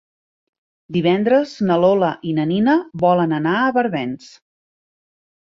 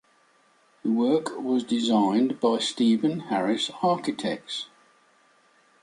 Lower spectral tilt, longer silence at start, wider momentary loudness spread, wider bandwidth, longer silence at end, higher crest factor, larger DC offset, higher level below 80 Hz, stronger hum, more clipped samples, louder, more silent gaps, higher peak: first, -7.5 dB/octave vs -5 dB/octave; about the same, 0.9 s vs 0.85 s; about the same, 8 LU vs 10 LU; second, 7.6 kHz vs 11.5 kHz; first, 1.3 s vs 1.15 s; about the same, 16 dB vs 16 dB; neither; first, -60 dBFS vs -74 dBFS; neither; neither; first, -18 LUFS vs -25 LUFS; neither; first, -4 dBFS vs -10 dBFS